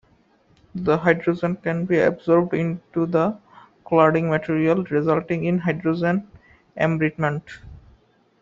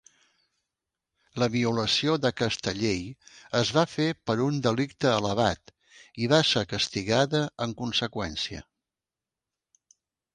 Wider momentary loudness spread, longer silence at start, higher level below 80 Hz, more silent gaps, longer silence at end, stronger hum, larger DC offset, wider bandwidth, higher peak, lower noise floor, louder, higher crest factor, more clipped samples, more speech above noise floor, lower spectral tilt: about the same, 9 LU vs 9 LU; second, 0.75 s vs 1.35 s; about the same, -56 dBFS vs -56 dBFS; neither; second, 0.6 s vs 1.75 s; neither; neither; second, 7.4 kHz vs 10.5 kHz; first, -2 dBFS vs -6 dBFS; second, -59 dBFS vs under -90 dBFS; first, -21 LUFS vs -26 LUFS; about the same, 20 dB vs 22 dB; neither; second, 38 dB vs over 63 dB; first, -7 dB/octave vs -4.5 dB/octave